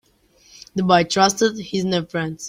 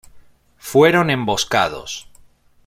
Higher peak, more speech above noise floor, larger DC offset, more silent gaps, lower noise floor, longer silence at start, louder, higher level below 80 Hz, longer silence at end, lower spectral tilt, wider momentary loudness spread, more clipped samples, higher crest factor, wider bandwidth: about the same, -2 dBFS vs -2 dBFS; about the same, 37 dB vs 34 dB; neither; neither; first, -56 dBFS vs -50 dBFS; first, 0.75 s vs 0.15 s; second, -19 LUFS vs -16 LUFS; second, -56 dBFS vs -50 dBFS; second, 0 s vs 0.65 s; about the same, -4 dB/octave vs -4.5 dB/octave; second, 9 LU vs 18 LU; neither; about the same, 18 dB vs 18 dB; about the same, 16 kHz vs 16.5 kHz